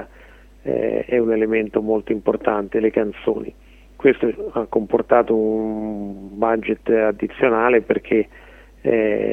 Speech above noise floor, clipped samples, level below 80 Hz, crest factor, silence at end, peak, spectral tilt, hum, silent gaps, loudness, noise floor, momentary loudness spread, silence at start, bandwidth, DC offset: 26 dB; under 0.1%; -48 dBFS; 18 dB; 0 s; -2 dBFS; -8.5 dB/octave; none; none; -20 LUFS; -45 dBFS; 10 LU; 0 s; 3.8 kHz; under 0.1%